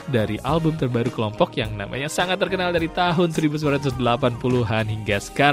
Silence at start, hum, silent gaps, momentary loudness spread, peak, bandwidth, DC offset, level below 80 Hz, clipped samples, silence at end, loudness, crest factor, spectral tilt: 0 s; none; none; 4 LU; -2 dBFS; 16 kHz; under 0.1%; -44 dBFS; under 0.1%; 0 s; -22 LUFS; 20 dB; -6 dB/octave